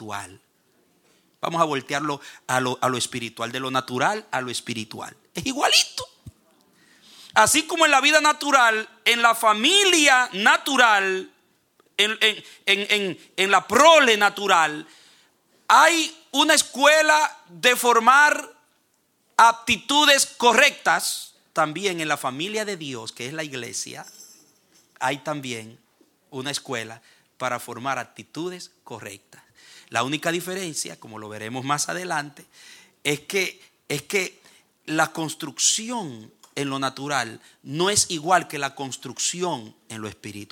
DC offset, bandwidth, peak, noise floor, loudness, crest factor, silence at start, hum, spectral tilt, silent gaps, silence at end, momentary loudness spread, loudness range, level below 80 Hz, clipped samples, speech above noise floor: under 0.1%; 19 kHz; -2 dBFS; -67 dBFS; -20 LUFS; 22 dB; 0 s; none; -1.5 dB/octave; none; 0.05 s; 18 LU; 13 LU; -66 dBFS; under 0.1%; 45 dB